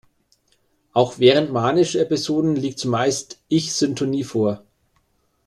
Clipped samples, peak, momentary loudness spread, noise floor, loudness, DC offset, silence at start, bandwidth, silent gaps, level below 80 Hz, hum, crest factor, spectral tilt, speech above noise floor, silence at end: under 0.1%; -2 dBFS; 8 LU; -65 dBFS; -20 LUFS; under 0.1%; 0.95 s; 12.5 kHz; none; -60 dBFS; none; 18 dB; -5 dB/octave; 46 dB; 0.9 s